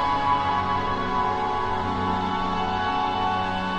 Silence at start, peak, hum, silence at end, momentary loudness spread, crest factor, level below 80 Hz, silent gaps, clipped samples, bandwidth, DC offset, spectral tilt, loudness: 0 s; -10 dBFS; none; 0 s; 3 LU; 14 dB; -42 dBFS; none; under 0.1%; 9.4 kHz; under 0.1%; -6 dB/octave; -24 LUFS